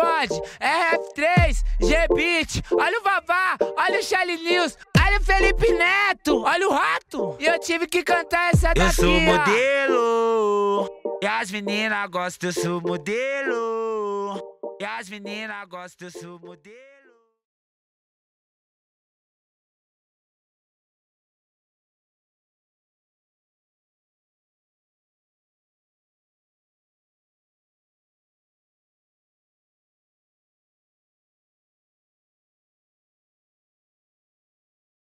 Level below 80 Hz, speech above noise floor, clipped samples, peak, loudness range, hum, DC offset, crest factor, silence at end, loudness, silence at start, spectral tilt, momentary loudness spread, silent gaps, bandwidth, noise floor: -34 dBFS; 36 dB; under 0.1%; -8 dBFS; 13 LU; none; under 0.1%; 18 dB; 18.4 s; -21 LUFS; 0 s; -4.5 dB/octave; 14 LU; none; 15 kHz; -58 dBFS